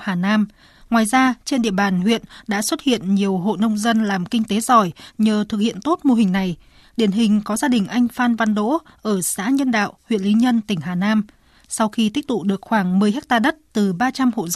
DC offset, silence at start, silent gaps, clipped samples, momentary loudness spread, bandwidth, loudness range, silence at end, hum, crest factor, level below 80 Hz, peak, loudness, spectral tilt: under 0.1%; 0 s; none; under 0.1%; 6 LU; 13.5 kHz; 1 LU; 0 s; none; 16 dB; -54 dBFS; -2 dBFS; -19 LUFS; -5 dB/octave